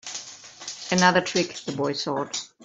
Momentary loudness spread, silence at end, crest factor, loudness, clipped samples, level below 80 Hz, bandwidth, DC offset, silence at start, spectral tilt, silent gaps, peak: 17 LU; 0.2 s; 22 dB; -24 LUFS; under 0.1%; -66 dBFS; 8.2 kHz; under 0.1%; 0.05 s; -3.5 dB/octave; none; -2 dBFS